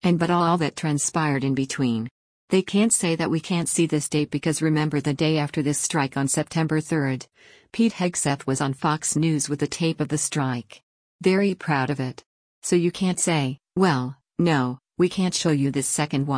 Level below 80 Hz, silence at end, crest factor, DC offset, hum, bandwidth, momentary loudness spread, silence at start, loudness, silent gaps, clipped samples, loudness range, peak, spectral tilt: -60 dBFS; 0 s; 16 dB; under 0.1%; none; 10.5 kHz; 5 LU; 0 s; -23 LUFS; 2.11-2.48 s, 10.83-11.19 s, 12.26-12.62 s; under 0.1%; 2 LU; -6 dBFS; -5 dB/octave